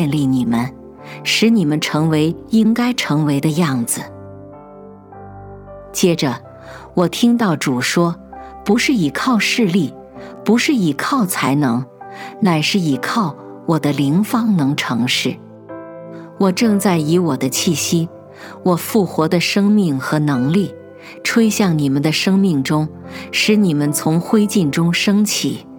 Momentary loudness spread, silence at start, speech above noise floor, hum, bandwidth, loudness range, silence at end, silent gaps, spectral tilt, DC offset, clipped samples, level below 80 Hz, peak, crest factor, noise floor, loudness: 19 LU; 0 s; 22 dB; none; 19.5 kHz; 3 LU; 0 s; none; -5 dB/octave; under 0.1%; under 0.1%; -54 dBFS; -2 dBFS; 16 dB; -38 dBFS; -16 LUFS